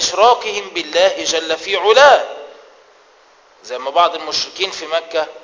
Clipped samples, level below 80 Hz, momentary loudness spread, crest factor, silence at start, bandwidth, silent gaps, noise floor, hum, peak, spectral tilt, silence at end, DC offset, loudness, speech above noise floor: under 0.1%; -58 dBFS; 13 LU; 16 dB; 0 s; 7.6 kHz; none; -49 dBFS; none; 0 dBFS; -0.5 dB/octave; 0.05 s; under 0.1%; -15 LUFS; 34 dB